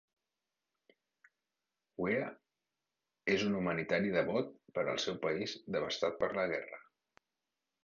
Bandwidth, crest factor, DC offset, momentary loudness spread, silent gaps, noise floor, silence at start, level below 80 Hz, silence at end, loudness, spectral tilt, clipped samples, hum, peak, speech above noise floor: 7.2 kHz; 20 dB; under 0.1%; 8 LU; none; under -90 dBFS; 2 s; -70 dBFS; 1.05 s; -36 LUFS; -3.5 dB/octave; under 0.1%; none; -18 dBFS; over 55 dB